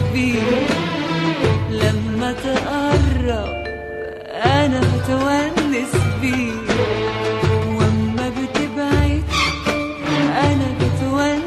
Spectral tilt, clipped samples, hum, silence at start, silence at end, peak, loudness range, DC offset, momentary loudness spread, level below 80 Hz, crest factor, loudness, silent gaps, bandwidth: -6 dB/octave; under 0.1%; none; 0 s; 0 s; -2 dBFS; 1 LU; under 0.1%; 5 LU; -32 dBFS; 16 dB; -19 LUFS; none; 13 kHz